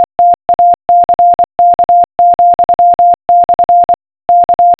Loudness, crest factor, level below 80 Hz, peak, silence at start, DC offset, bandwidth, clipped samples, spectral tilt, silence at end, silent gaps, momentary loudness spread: -8 LUFS; 6 dB; -44 dBFS; -2 dBFS; 0 s; under 0.1%; 4 kHz; under 0.1%; -9 dB/octave; 0.05 s; none; 3 LU